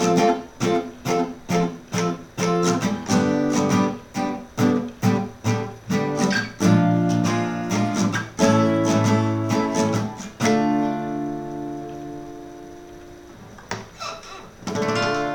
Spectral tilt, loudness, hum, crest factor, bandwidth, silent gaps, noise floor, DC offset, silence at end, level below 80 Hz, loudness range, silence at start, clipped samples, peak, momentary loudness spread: -5.5 dB/octave; -22 LUFS; none; 18 dB; 18 kHz; none; -42 dBFS; under 0.1%; 0 s; -52 dBFS; 10 LU; 0 s; under 0.1%; -4 dBFS; 16 LU